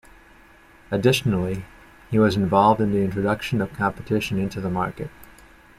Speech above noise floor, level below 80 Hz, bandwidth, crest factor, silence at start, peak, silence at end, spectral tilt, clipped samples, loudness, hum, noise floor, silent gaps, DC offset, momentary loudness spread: 29 dB; -48 dBFS; 15 kHz; 18 dB; 0.9 s; -4 dBFS; 0.55 s; -6.5 dB/octave; under 0.1%; -22 LUFS; none; -51 dBFS; none; under 0.1%; 11 LU